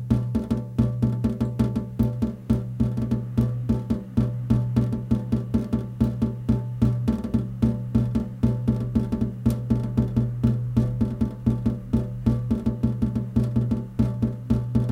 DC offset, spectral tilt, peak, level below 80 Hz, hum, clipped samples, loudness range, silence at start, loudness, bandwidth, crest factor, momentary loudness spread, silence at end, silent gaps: under 0.1%; -10 dB/octave; -6 dBFS; -36 dBFS; none; under 0.1%; 1 LU; 0 s; -25 LUFS; 6.6 kHz; 18 dB; 3 LU; 0 s; none